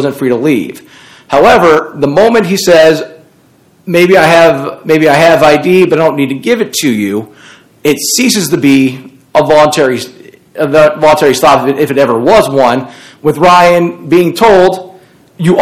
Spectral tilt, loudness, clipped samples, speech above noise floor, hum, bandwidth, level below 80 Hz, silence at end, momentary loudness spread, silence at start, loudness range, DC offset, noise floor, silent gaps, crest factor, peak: -4.5 dB/octave; -8 LUFS; 6%; 38 dB; none; 16.5 kHz; -42 dBFS; 0 s; 11 LU; 0 s; 3 LU; under 0.1%; -46 dBFS; none; 8 dB; 0 dBFS